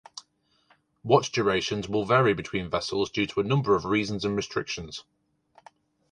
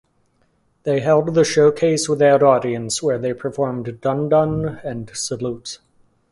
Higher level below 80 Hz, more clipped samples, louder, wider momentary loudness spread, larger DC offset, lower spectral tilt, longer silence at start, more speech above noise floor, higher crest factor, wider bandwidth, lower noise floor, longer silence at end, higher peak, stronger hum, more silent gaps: about the same, -56 dBFS vs -52 dBFS; neither; second, -26 LUFS vs -18 LUFS; about the same, 16 LU vs 14 LU; neither; about the same, -5.5 dB/octave vs -5 dB/octave; second, 0.15 s vs 0.85 s; about the same, 41 dB vs 44 dB; first, 24 dB vs 18 dB; second, 10 kHz vs 11.5 kHz; first, -67 dBFS vs -62 dBFS; first, 1.1 s vs 0.55 s; about the same, -4 dBFS vs -2 dBFS; neither; neither